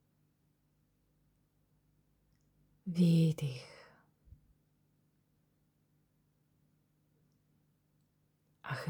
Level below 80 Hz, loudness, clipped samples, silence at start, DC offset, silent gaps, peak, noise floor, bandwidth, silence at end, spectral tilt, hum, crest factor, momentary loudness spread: -74 dBFS; -32 LUFS; under 0.1%; 2.85 s; under 0.1%; none; -20 dBFS; -76 dBFS; 15 kHz; 0 s; -7.5 dB/octave; 50 Hz at -70 dBFS; 20 dB; 23 LU